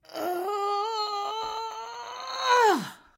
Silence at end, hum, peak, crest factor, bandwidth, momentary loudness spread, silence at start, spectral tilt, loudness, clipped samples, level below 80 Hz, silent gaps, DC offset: 0.2 s; none; -8 dBFS; 20 dB; 16.5 kHz; 15 LU; 0.1 s; -2.5 dB/octave; -27 LUFS; under 0.1%; -72 dBFS; none; under 0.1%